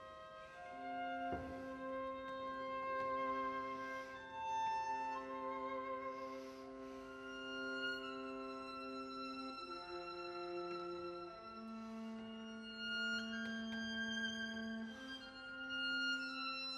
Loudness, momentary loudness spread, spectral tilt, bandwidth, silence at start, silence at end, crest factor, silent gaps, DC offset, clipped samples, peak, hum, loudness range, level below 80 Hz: -45 LUFS; 10 LU; -3.5 dB/octave; 13 kHz; 0 s; 0 s; 14 dB; none; under 0.1%; under 0.1%; -32 dBFS; none; 5 LU; -72 dBFS